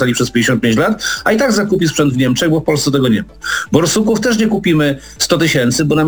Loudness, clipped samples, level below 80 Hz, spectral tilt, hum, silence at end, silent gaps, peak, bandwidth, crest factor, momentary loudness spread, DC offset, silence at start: -13 LUFS; under 0.1%; -40 dBFS; -4.5 dB/octave; none; 0 s; none; 0 dBFS; over 20 kHz; 14 dB; 3 LU; 0.2%; 0 s